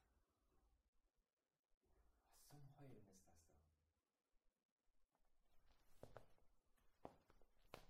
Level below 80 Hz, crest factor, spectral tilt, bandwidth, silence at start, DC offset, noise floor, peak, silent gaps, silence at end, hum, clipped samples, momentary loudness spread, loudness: -82 dBFS; 34 dB; -5 dB/octave; 15 kHz; 0 s; under 0.1%; -90 dBFS; -38 dBFS; 0.88-0.93 s, 1.33-1.37 s, 1.59-1.63 s, 1.77-1.81 s, 4.65-4.76 s; 0 s; none; under 0.1%; 2 LU; -67 LUFS